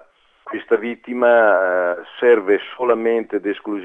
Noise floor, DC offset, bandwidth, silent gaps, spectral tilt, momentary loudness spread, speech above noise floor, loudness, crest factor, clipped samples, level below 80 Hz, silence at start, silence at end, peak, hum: -42 dBFS; under 0.1%; 3.8 kHz; none; -6.5 dB/octave; 11 LU; 25 dB; -18 LUFS; 16 dB; under 0.1%; -68 dBFS; 0.45 s; 0 s; -2 dBFS; none